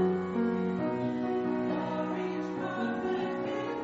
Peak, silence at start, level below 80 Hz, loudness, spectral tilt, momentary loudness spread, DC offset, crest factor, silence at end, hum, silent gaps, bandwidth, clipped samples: -18 dBFS; 0 s; -66 dBFS; -32 LUFS; -6 dB/octave; 3 LU; under 0.1%; 14 dB; 0 s; none; none; 7.6 kHz; under 0.1%